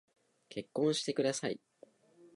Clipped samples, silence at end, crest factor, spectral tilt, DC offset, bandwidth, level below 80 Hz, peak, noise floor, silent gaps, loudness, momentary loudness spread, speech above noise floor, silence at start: under 0.1%; 0.1 s; 18 dB; -4 dB/octave; under 0.1%; 11.5 kHz; -82 dBFS; -20 dBFS; -63 dBFS; none; -35 LUFS; 14 LU; 29 dB; 0.5 s